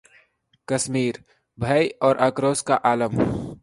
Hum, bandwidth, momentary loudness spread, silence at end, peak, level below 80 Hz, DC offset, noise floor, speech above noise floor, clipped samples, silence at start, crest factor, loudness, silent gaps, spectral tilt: none; 11.5 kHz; 8 LU; 0.05 s; -4 dBFS; -50 dBFS; under 0.1%; -62 dBFS; 40 dB; under 0.1%; 0.7 s; 20 dB; -22 LUFS; none; -5 dB/octave